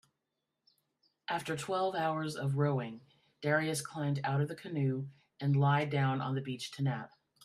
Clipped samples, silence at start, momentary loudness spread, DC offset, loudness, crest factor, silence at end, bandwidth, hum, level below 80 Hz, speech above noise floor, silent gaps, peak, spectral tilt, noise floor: under 0.1%; 1.3 s; 10 LU; under 0.1%; -34 LUFS; 18 dB; 0.4 s; 13 kHz; none; -76 dBFS; 53 dB; none; -18 dBFS; -6 dB/octave; -86 dBFS